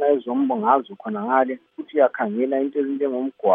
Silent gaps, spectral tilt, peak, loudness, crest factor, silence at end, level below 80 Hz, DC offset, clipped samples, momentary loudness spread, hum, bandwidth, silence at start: none; -10 dB/octave; -4 dBFS; -22 LUFS; 18 dB; 0 s; -82 dBFS; under 0.1%; under 0.1%; 8 LU; none; 3.7 kHz; 0 s